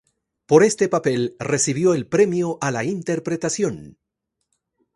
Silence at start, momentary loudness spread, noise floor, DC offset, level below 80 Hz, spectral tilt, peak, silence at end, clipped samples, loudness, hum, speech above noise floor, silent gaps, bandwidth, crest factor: 0.5 s; 9 LU; -79 dBFS; under 0.1%; -60 dBFS; -5 dB/octave; 0 dBFS; 1.05 s; under 0.1%; -20 LUFS; none; 59 dB; none; 11.5 kHz; 20 dB